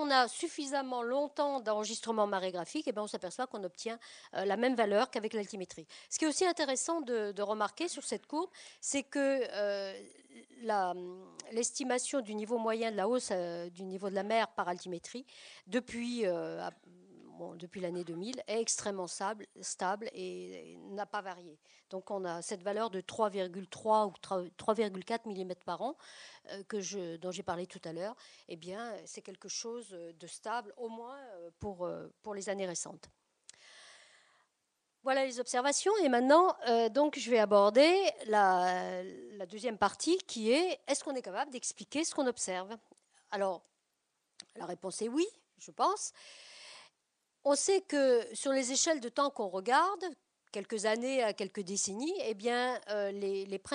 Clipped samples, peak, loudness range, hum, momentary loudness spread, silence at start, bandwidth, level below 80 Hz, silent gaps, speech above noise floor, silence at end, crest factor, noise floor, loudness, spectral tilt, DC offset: under 0.1%; -12 dBFS; 13 LU; none; 17 LU; 0 s; 10 kHz; -78 dBFS; none; 48 dB; 0 s; 24 dB; -82 dBFS; -34 LUFS; -3 dB/octave; under 0.1%